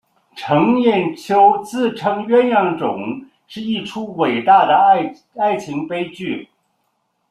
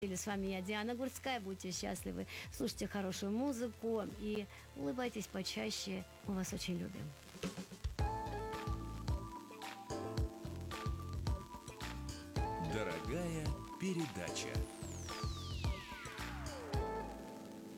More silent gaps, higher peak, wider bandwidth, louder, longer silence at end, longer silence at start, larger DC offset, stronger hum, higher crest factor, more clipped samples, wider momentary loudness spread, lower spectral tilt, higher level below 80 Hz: neither; first, -2 dBFS vs -26 dBFS; second, 12.5 kHz vs 17 kHz; first, -16 LUFS vs -43 LUFS; first, 0.85 s vs 0 s; first, 0.35 s vs 0 s; neither; neither; about the same, 16 dB vs 16 dB; neither; first, 14 LU vs 7 LU; about the same, -6 dB/octave vs -5 dB/octave; second, -62 dBFS vs -50 dBFS